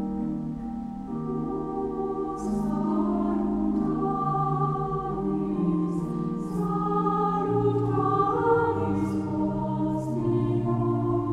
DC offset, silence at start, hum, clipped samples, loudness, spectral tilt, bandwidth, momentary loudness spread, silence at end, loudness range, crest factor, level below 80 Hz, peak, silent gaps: under 0.1%; 0 s; none; under 0.1%; -27 LUFS; -9.5 dB/octave; 11 kHz; 7 LU; 0 s; 3 LU; 16 dB; -46 dBFS; -10 dBFS; none